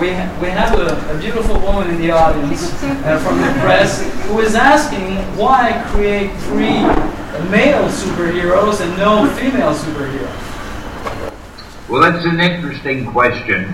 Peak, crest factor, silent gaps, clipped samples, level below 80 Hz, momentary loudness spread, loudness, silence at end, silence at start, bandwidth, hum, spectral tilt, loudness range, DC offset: 0 dBFS; 14 dB; none; under 0.1%; -26 dBFS; 13 LU; -15 LUFS; 0 s; 0 s; 15.5 kHz; none; -5.5 dB/octave; 4 LU; under 0.1%